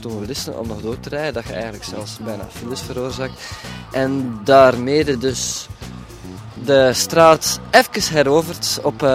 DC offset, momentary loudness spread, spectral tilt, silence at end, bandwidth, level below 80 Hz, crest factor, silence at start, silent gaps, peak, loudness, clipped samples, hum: under 0.1%; 19 LU; -4 dB/octave; 0 s; 16.5 kHz; -44 dBFS; 18 dB; 0 s; none; 0 dBFS; -17 LUFS; under 0.1%; none